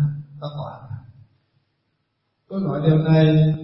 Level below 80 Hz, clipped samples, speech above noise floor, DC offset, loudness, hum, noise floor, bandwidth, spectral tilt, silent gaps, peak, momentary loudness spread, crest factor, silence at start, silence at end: -54 dBFS; under 0.1%; 56 dB; under 0.1%; -19 LUFS; none; -72 dBFS; 5.8 kHz; -12.5 dB/octave; none; -4 dBFS; 21 LU; 18 dB; 0 s; 0 s